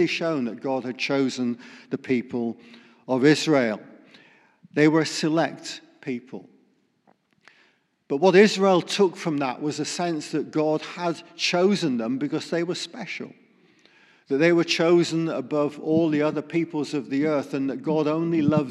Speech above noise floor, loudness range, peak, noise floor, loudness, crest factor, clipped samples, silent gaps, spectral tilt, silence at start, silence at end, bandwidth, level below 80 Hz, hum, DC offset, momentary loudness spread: 41 dB; 4 LU; -4 dBFS; -65 dBFS; -24 LUFS; 20 dB; under 0.1%; none; -5.5 dB/octave; 0 s; 0 s; 12 kHz; -76 dBFS; none; under 0.1%; 14 LU